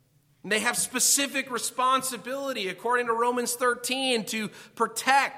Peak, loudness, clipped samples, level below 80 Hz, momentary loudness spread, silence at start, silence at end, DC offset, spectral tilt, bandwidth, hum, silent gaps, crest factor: -6 dBFS; -26 LUFS; under 0.1%; -76 dBFS; 10 LU; 0.45 s; 0 s; under 0.1%; -1 dB/octave; 16.5 kHz; none; none; 22 dB